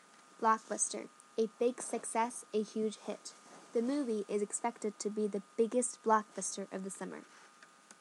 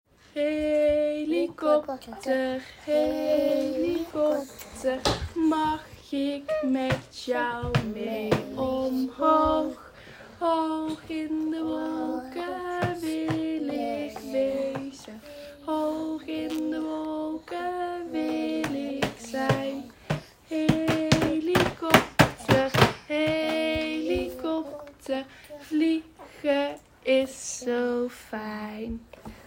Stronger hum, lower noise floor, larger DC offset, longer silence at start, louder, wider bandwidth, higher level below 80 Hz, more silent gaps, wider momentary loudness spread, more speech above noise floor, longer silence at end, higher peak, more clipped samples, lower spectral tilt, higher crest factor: neither; first, -60 dBFS vs -47 dBFS; neither; about the same, 0.4 s vs 0.35 s; second, -36 LUFS vs -27 LUFS; second, 12 kHz vs 16 kHz; second, under -90 dBFS vs -52 dBFS; neither; about the same, 13 LU vs 12 LU; first, 25 dB vs 20 dB; about the same, 0.1 s vs 0.05 s; second, -16 dBFS vs -2 dBFS; neither; second, -3.5 dB/octave vs -5.5 dB/octave; about the same, 22 dB vs 26 dB